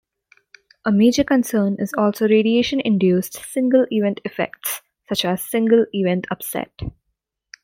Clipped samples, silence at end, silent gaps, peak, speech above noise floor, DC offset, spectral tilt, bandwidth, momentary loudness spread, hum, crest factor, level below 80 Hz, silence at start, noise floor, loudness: under 0.1%; 0.75 s; none; -4 dBFS; 58 dB; under 0.1%; -5.5 dB/octave; 16.5 kHz; 11 LU; none; 16 dB; -50 dBFS; 0.85 s; -76 dBFS; -19 LUFS